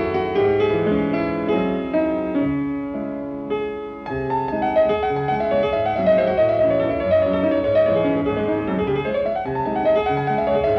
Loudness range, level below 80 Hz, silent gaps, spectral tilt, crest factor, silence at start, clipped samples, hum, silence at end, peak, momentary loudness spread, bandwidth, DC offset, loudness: 4 LU; -44 dBFS; none; -9 dB/octave; 12 dB; 0 s; under 0.1%; none; 0 s; -6 dBFS; 8 LU; 5.8 kHz; under 0.1%; -20 LUFS